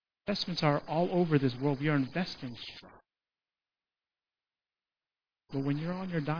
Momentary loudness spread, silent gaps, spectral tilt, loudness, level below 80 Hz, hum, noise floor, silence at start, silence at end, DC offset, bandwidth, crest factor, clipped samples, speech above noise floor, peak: 13 LU; none; -7.5 dB/octave; -32 LUFS; -64 dBFS; none; under -90 dBFS; 0.25 s; 0 s; under 0.1%; 5.4 kHz; 22 dB; under 0.1%; over 59 dB; -12 dBFS